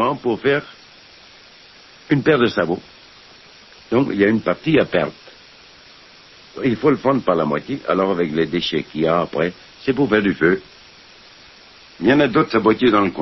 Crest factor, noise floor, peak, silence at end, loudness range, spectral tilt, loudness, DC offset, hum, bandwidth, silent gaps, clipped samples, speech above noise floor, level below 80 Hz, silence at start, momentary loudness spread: 18 dB; -45 dBFS; 0 dBFS; 0 s; 3 LU; -7.5 dB/octave; -18 LUFS; under 0.1%; none; 6 kHz; none; under 0.1%; 28 dB; -52 dBFS; 0 s; 8 LU